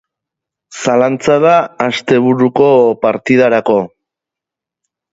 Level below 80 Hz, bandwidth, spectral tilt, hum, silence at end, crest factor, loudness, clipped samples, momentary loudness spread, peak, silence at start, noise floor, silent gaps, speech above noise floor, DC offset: -54 dBFS; 8 kHz; -6 dB/octave; none; 1.25 s; 12 dB; -11 LUFS; under 0.1%; 7 LU; 0 dBFS; 0.7 s; -84 dBFS; none; 74 dB; under 0.1%